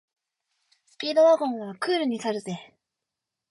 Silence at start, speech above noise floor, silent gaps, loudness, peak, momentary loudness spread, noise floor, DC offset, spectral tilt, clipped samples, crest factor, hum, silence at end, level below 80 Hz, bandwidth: 1 s; 62 dB; none; -24 LUFS; -10 dBFS; 15 LU; -86 dBFS; under 0.1%; -5 dB/octave; under 0.1%; 16 dB; none; 0.85 s; -78 dBFS; 11.5 kHz